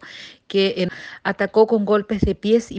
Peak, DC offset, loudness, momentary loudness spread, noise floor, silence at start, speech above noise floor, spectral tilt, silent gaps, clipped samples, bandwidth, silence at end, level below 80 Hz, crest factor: -2 dBFS; under 0.1%; -20 LUFS; 10 LU; -41 dBFS; 0.05 s; 22 dB; -6 dB/octave; none; under 0.1%; 8.6 kHz; 0 s; -40 dBFS; 18 dB